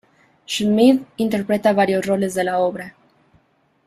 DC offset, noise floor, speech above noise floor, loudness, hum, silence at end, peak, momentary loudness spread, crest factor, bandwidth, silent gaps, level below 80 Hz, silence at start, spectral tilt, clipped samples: under 0.1%; -61 dBFS; 43 dB; -18 LUFS; none; 0.95 s; -2 dBFS; 10 LU; 16 dB; 14.5 kHz; none; -60 dBFS; 0.5 s; -5.5 dB/octave; under 0.1%